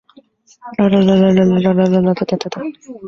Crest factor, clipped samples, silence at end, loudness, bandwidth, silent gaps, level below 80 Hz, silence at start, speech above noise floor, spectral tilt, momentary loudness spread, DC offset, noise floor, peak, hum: 12 dB; under 0.1%; 0 s; -14 LUFS; 7 kHz; none; -50 dBFS; 0.65 s; 34 dB; -8 dB/octave; 15 LU; under 0.1%; -48 dBFS; -2 dBFS; none